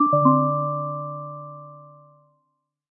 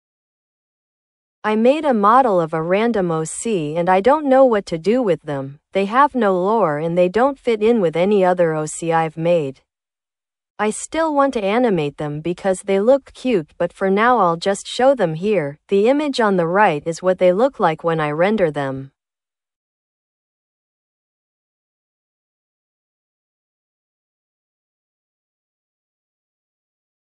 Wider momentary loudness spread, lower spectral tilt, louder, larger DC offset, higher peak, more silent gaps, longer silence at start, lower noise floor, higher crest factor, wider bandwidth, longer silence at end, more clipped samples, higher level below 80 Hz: first, 23 LU vs 8 LU; first, -16 dB/octave vs -5.5 dB/octave; second, -22 LUFS vs -17 LUFS; neither; second, -4 dBFS vs 0 dBFS; second, none vs 10.50-10.55 s; second, 0 s vs 1.45 s; second, -75 dBFS vs under -90 dBFS; about the same, 20 dB vs 18 dB; second, 1.7 kHz vs 11.5 kHz; second, 1.05 s vs 8.3 s; neither; second, -78 dBFS vs -58 dBFS